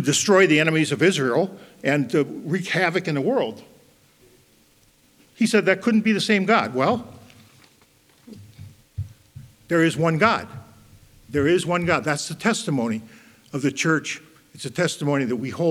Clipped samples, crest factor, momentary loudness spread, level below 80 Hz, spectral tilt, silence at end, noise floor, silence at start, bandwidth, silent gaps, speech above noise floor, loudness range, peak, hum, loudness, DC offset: under 0.1%; 22 dB; 15 LU; -58 dBFS; -4.5 dB/octave; 0 s; -58 dBFS; 0 s; 15.5 kHz; none; 37 dB; 4 LU; -2 dBFS; none; -21 LUFS; under 0.1%